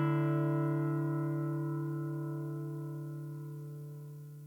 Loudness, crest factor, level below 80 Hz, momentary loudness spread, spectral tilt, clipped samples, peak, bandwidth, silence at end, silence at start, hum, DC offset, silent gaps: -36 LUFS; 14 dB; -82 dBFS; 14 LU; -9.5 dB/octave; under 0.1%; -22 dBFS; 17 kHz; 0 s; 0 s; none; under 0.1%; none